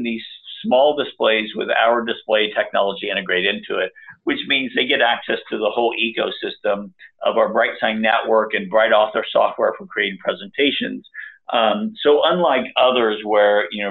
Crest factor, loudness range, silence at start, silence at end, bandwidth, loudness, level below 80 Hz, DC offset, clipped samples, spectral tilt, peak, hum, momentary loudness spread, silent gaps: 18 dB; 2 LU; 0 s; 0 s; 4.4 kHz; -18 LUFS; -64 dBFS; under 0.1%; under 0.1%; -7.5 dB/octave; -2 dBFS; none; 9 LU; none